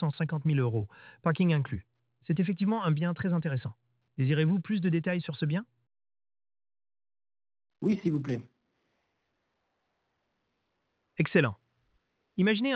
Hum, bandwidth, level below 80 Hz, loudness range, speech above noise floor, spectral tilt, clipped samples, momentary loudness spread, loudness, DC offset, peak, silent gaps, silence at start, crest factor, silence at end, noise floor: none; 6 kHz; -66 dBFS; 7 LU; 51 dB; -9 dB/octave; under 0.1%; 13 LU; -30 LUFS; under 0.1%; -12 dBFS; none; 0 s; 20 dB; 0 s; -79 dBFS